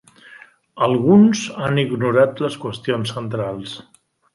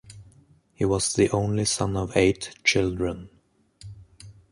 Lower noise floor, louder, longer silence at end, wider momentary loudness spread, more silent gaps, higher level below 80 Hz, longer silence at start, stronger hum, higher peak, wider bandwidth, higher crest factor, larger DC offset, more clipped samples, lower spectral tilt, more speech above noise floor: second, -46 dBFS vs -57 dBFS; first, -18 LUFS vs -24 LUFS; first, 0.55 s vs 0.2 s; second, 14 LU vs 18 LU; neither; second, -58 dBFS vs -46 dBFS; first, 0.3 s vs 0.05 s; neither; first, -2 dBFS vs -6 dBFS; about the same, 11.5 kHz vs 11.5 kHz; about the same, 16 dB vs 20 dB; neither; neither; first, -6.5 dB/octave vs -4.5 dB/octave; second, 28 dB vs 34 dB